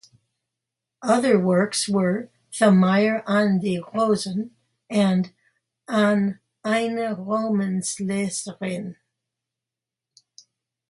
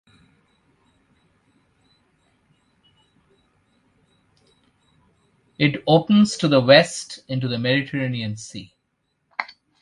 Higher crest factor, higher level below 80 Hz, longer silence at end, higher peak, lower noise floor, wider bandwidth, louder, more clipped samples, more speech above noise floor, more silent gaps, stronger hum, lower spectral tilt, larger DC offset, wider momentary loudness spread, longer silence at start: second, 18 dB vs 24 dB; second, -68 dBFS vs -62 dBFS; first, 1.95 s vs 0.35 s; second, -6 dBFS vs 0 dBFS; first, -88 dBFS vs -72 dBFS; about the same, 11.5 kHz vs 11.5 kHz; second, -22 LUFS vs -19 LUFS; neither; first, 67 dB vs 54 dB; neither; neither; about the same, -5.5 dB/octave vs -5.5 dB/octave; neither; second, 12 LU vs 19 LU; second, 1 s vs 5.6 s